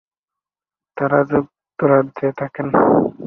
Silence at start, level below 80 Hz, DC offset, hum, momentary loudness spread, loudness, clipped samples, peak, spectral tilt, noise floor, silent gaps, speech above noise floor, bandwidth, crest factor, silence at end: 0.95 s; -54 dBFS; under 0.1%; none; 11 LU; -17 LUFS; under 0.1%; -2 dBFS; -11 dB/octave; under -90 dBFS; none; over 74 dB; 3.9 kHz; 18 dB; 0 s